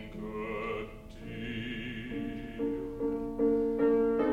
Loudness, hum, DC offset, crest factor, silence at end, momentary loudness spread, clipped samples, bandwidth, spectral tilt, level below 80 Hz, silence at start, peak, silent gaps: -33 LUFS; none; under 0.1%; 16 dB; 0 s; 13 LU; under 0.1%; 7.6 kHz; -7.5 dB/octave; -50 dBFS; 0 s; -16 dBFS; none